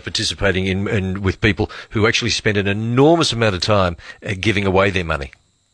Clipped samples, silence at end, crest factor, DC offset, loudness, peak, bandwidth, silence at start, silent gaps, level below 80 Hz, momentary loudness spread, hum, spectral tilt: under 0.1%; 0.45 s; 16 dB; under 0.1%; -18 LUFS; -2 dBFS; 10.5 kHz; 0.05 s; none; -38 dBFS; 9 LU; none; -5 dB/octave